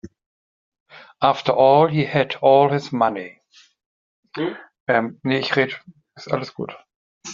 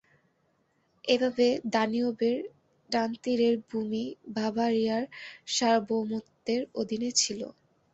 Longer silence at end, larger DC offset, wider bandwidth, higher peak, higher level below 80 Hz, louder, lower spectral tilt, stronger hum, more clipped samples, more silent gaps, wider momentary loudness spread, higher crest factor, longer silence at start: second, 0 s vs 0.4 s; neither; second, 7.4 kHz vs 8.2 kHz; first, -2 dBFS vs -10 dBFS; first, -62 dBFS vs -72 dBFS; first, -19 LUFS vs -29 LUFS; about the same, -4 dB/octave vs -3 dB/octave; neither; neither; first, 0.26-0.72 s, 0.80-0.86 s, 3.86-4.23 s, 4.80-4.86 s, 6.96-7.21 s vs none; first, 19 LU vs 10 LU; about the same, 18 dB vs 20 dB; second, 0.05 s vs 1.05 s